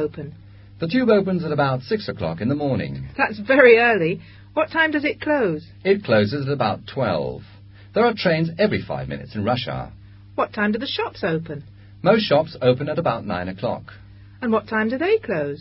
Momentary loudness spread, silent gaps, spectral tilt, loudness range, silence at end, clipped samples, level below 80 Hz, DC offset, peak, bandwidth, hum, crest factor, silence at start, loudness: 12 LU; none; -10 dB/octave; 5 LU; 0 s; under 0.1%; -50 dBFS; under 0.1%; 0 dBFS; 5.8 kHz; none; 22 dB; 0 s; -21 LUFS